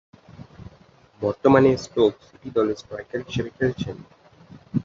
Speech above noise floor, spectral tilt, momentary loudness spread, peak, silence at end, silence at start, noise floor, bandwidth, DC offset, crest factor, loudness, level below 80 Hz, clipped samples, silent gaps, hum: 31 dB; -7 dB/octave; 22 LU; -2 dBFS; 0 s; 0.4 s; -53 dBFS; 7.6 kHz; under 0.1%; 22 dB; -23 LUFS; -52 dBFS; under 0.1%; none; none